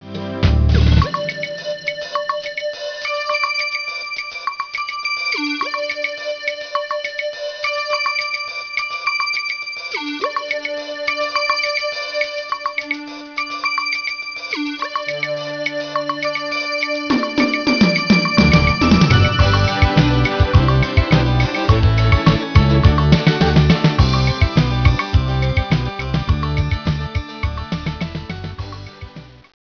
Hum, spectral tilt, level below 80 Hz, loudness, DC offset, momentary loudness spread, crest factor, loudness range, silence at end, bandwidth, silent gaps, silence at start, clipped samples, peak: none; -6 dB/octave; -26 dBFS; -18 LUFS; under 0.1%; 11 LU; 18 dB; 8 LU; 0.35 s; 5.4 kHz; none; 0 s; under 0.1%; 0 dBFS